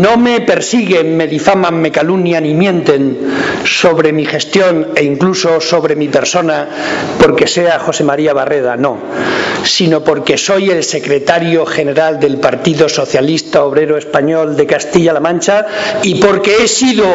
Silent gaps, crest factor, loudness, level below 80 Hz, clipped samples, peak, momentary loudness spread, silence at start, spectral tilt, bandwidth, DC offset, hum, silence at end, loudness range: none; 10 dB; -11 LUFS; -46 dBFS; 0.1%; 0 dBFS; 4 LU; 0 s; -4.5 dB/octave; 8 kHz; under 0.1%; none; 0 s; 1 LU